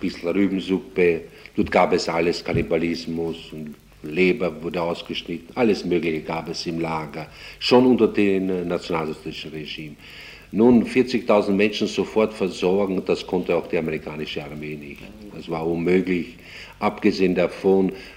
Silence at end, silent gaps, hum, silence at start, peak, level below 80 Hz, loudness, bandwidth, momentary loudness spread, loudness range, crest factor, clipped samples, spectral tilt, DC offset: 0 s; none; none; 0 s; -4 dBFS; -50 dBFS; -22 LUFS; 16 kHz; 16 LU; 5 LU; 18 dB; under 0.1%; -6 dB/octave; under 0.1%